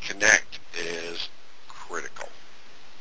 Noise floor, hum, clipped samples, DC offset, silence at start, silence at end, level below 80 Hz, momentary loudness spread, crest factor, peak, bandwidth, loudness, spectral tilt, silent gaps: -51 dBFS; none; under 0.1%; 2%; 0 s; 0.1 s; -60 dBFS; 23 LU; 28 dB; -2 dBFS; 8 kHz; -25 LUFS; -0.5 dB/octave; none